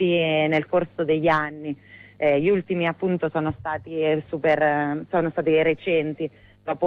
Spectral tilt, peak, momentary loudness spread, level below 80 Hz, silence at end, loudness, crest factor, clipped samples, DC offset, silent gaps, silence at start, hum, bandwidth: -8.5 dB/octave; -8 dBFS; 11 LU; -56 dBFS; 0 s; -23 LUFS; 14 dB; under 0.1%; under 0.1%; none; 0 s; none; 6 kHz